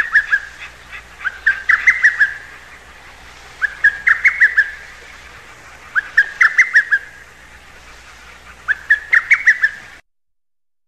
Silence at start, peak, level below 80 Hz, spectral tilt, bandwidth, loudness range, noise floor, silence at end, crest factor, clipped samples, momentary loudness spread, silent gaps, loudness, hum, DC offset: 0 s; -2 dBFS; -48 dBFS; -0.5 dB/octave; 13.5 kHz; 3 LU; -85 dBFS; 1 s; 16 dB; under 0.1%; 22 LU; none; -13 LUFS; none; 0.3%